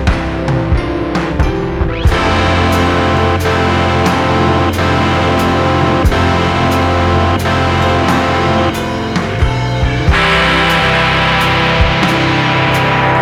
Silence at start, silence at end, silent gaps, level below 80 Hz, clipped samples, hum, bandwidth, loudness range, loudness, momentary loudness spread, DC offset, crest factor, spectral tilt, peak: 0 s; 0 s; none; -22 dBFS; under 0.1%; none; 15.5 kHz; 2 LU; -12 LUFS; 5 LU; under 0.1%; 10 dB; -5.5 dB/octave; 0 dBFS